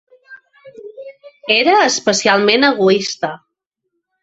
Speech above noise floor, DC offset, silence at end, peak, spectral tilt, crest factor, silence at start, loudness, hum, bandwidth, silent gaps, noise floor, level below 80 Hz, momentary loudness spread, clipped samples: 61 dB; under 0.1%; 0.85 s; -2 dBFS; -2.5 dB/octave; 16 dB; 0.3 s; -13 LUFS; none; 8 kHz; none; -74 dBFS; -62 dBFS; 21 LU; under 0.1%